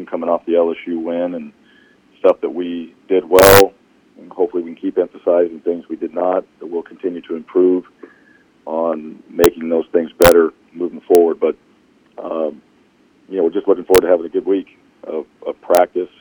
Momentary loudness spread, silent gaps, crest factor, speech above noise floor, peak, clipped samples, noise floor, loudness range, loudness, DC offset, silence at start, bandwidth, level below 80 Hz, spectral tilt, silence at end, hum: 16 LU; none; 16 dB; 38 dB; 0 dBFS; under 0.1%; -54 dBFS; 6 LU; -16 LUFS; under 0.1%; 0 s; 16 kHz; -44 dBFS; -4.5 dB/octave; 0.15 s; none